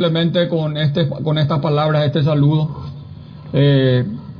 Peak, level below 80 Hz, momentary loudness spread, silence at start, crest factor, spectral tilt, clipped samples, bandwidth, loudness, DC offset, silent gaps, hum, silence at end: -4 dBFS; -48 dBFS; 16 LU; 0 s; 14 dB; -9.5 dB/octave; under 0.1%; 5.4 kHz; -16 LUFS; under 0.1%; none; none; 0 s